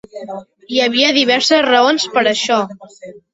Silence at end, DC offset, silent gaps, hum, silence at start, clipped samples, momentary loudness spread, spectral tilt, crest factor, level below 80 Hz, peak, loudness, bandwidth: 0.15 s; under 0.1%; none; none; 0.15 s; under 0.1%; 18 LU; -2 dB/octave; 14 dB; -62 dBFS; -2 dBFS; -13 LUFS; 8 kHz